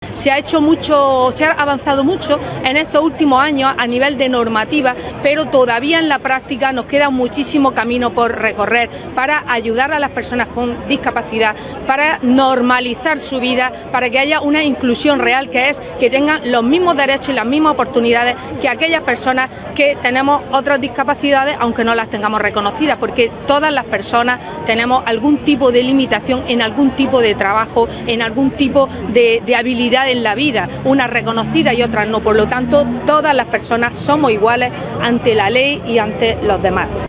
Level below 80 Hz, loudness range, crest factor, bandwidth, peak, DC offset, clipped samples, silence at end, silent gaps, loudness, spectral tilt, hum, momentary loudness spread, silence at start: -40 dBFS; 2 LU; 14 dB; 4 kHz; 0 dBFS; under 0.1%; under 0.1%; 0 s; none; -14 LUFS; -9 dB/octave; none; 5 LU; 0 s